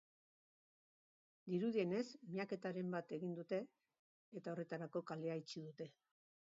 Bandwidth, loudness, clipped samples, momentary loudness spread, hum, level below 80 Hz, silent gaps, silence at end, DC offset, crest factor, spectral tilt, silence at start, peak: 7.4 kHz; -46 LUFS; under 0.1%; 14 LU; none; under -90 dBFS; 3.99-4.32 s; 0.6 s; under 0.1%; 18 dB; -6 dB/octave; 1.45 s; -28 dBFS